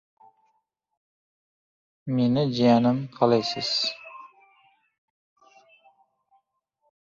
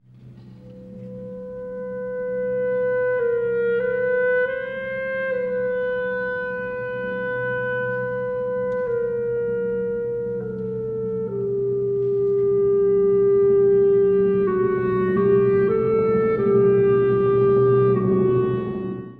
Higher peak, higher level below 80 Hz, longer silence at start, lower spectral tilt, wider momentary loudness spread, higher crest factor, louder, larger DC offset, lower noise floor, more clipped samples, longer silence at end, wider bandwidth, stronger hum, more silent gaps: first, -4 dBFS vs -8 dBFS; second, -66 dBFS vs -52 dBFS; first, 2.05 s vs 0.2 s; second, -6 dB/octave vs -10.5 dB/octave; first, 21 LU vs 11 LU; first, 24 dB vs 12 dB; about the same, -23 LUFS vs -21 LUFS; neither; first, -74 dBFS vs -44 dBFS; neither; first, 2.75 s vs 0.05 s; first, 7.6 kHz vs 3.9 kHz; neither; neither